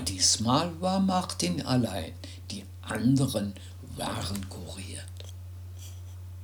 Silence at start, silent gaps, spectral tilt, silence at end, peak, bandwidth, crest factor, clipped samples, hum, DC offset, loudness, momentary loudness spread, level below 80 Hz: 0 s; none; -4 dB/octave; 0 s; -10 dBFS; over 20 kHz; 20 dB; under 0.1%; none; under 0.1%; -29 LUFS; 18 LU; -54 dBFS